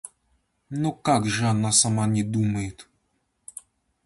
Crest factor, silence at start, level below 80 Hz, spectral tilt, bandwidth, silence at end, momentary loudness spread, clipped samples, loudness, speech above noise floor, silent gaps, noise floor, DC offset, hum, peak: 20 dB; 0.05 s; -54 dBFS; -4 dB/octave; 11.5 kHz; 1.25 s; 23 LU; under 0.1%; -23 LUFS; 49 dB; none; -72 dBFS; under 0.1%; none; -6 dBFS